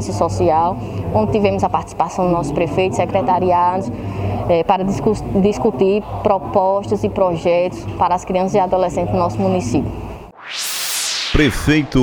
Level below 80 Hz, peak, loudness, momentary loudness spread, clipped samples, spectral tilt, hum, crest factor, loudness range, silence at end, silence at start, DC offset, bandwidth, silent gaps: -34 dBFS; 0 dBFS; -17 LUFS; 7 LU; under 0.1%; -5.5 dB/octave; none; 16 dB; 2 LU; 0 s; 0 s; under 0.1%; 18 kHz; none